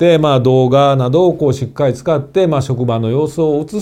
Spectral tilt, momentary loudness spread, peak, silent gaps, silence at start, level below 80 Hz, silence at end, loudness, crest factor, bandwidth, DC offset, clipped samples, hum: -7.5 dB/octave; 6 LU; 0 dBFS; none; 0 s; -46 dBFS; 0 s; -13 LUFS; 12 dB; 10.5 kHz; under 0.1%; under 0.1%; none